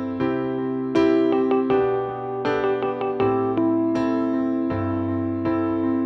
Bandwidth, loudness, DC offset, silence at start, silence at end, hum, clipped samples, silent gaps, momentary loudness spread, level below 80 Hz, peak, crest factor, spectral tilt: 6.4 kHz; -22 LUFS; under 0.1%; 0 s; 0 s; none; under 0.1%; none; 5 LU; -54 dBFS; -8 dBFS; 14 dB; -8.5 dB/octave